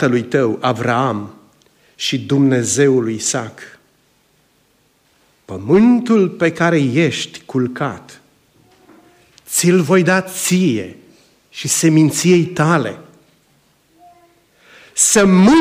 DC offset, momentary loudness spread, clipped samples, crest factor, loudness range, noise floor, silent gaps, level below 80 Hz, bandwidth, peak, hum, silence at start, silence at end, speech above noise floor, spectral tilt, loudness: under 0.1%; 15 LU; under 0.1%; 14 dB; 4 LU; -58 dBFS; none; -54 dBFS; 16 kHz; -2 dBFS; none; 0 s; 0 s; 44 dB; -4.5 dB/octave; -15 LUFS